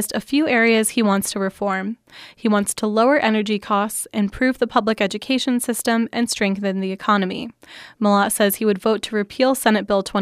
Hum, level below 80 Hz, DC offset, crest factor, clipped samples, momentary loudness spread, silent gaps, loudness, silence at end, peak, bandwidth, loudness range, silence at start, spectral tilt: none; -54 dBFS; under 0.1%; 16 dB; under 0.1%; 8 LU; none; -19 LUFS; 0 s; -2 dBFS; 15.5 kHz; 2 LU; 0 s; -4 dB/octave